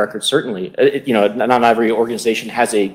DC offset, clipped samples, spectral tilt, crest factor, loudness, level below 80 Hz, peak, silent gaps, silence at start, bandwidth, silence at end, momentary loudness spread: under 0.1%; under 0.1%; -4 dB/octave; 16 dB; -16 LUFS; -60 dBFS; 0 dBFS; none; 0 s; 16.5 kHz; 0 s; 6 LU